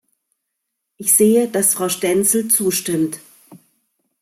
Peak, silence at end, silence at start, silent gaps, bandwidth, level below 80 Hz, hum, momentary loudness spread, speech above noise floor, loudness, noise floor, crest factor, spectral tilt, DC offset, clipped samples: -2 dBFS; 0.65 s; 1 s; none; 16 kHz; -64 dBFS; none; 10 LU; 61 dB; -16 LUFS; -77 dBFS; 18 dB; -3.5 dB/octave; under 0.1%; under 0.1%